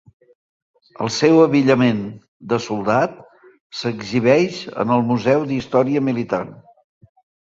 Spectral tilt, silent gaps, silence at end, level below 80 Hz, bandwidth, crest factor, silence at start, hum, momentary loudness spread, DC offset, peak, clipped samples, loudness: -6 dB/octave; 2.28-2.40 s, 3.60-3.70 s; 0.9 s; -58 dBFS; 7.8 kHz; 18 dB; 1 s; none; 12 LU; under 0.1%; -2 dBFS; under 0.1%; -18 LUFS